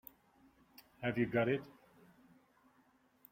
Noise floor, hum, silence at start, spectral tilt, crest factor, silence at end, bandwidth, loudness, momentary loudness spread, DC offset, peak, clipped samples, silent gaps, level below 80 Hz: -71 dBFS; none; 1 s; -8 dB/octave; 20 dB; 1.6 s; 16.5 kHz; -37 LUFS; 24 LU; under 0.1%; -22 dBFS; under 0.1%; none; -74 dBFS